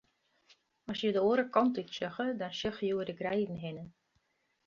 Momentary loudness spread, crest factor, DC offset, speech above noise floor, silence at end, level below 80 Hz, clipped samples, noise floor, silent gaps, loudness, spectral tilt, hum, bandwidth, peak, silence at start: 14 LU; 22 dB; under 0.1%; 44 dB; 0.75 s; -68 dBFS; under 0.1%; -77 dBFS; none; -33 LUFS; -6 dB/octave; none; 7.2 kHz; -12 dBFS; 0.9 s